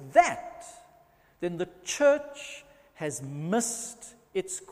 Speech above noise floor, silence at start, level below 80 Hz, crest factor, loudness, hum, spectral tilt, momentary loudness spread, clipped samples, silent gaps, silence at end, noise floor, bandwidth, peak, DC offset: 32 dB; 0 s; -66 dBFS; 24 dB; -29 LUFS; none; -4 dB/octave; 20 LU; under 0.1%; none; 0 s; -61 dBFS; 15.5 kHz; -6 dBFS; under 0.1%